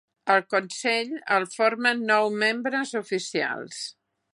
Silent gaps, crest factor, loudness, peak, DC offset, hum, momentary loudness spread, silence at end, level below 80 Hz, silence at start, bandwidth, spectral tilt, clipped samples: none; 20 dB; -24 LUFS; -6 dBFS; under 0.1%; none; 8 LU; 0.4 s; -82 dBFS; 0.25 s; 11.5 kHz; -3 dB/octave; under 0.1%